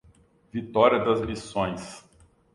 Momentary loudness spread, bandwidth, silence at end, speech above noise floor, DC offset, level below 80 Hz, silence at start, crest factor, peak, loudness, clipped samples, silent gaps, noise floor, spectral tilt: 19 LU; 11.5 kHz; 0.55 s; 34 dB; under 0.1%; -52 dBFS; 0.55 s; 22 dB; -4 dBFS; -25 LUFS; under 0.1%; none; -59 dBFS; -5.5 dB/octave